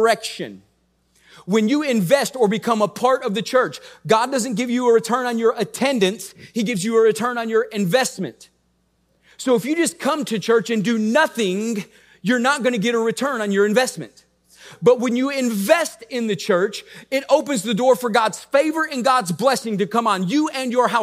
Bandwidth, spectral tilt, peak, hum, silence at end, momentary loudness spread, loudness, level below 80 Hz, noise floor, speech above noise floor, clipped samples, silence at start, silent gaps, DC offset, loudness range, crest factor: 16 kHz; -4.5 dB/octave; -2 dBFS; none; 0 s; 8 LU; -19 LUFS; -70 dBFS; -65 dBFS; 45 dB; under 0.1%; 0 s; none; under 0.1%; 2 LU; 18 dB